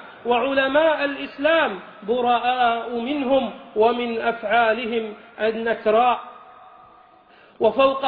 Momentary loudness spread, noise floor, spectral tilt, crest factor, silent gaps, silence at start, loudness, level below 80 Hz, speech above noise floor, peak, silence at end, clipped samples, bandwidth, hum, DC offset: 8 LU; -51 dBFS; -7.5 dB/octave; 16 dB; none; 0 s; -21 LUFS; -60 dBFS; 31 dB; -6 dBFS; 0 s; under 0.1%; 4.9 kHz; none; under 0.1%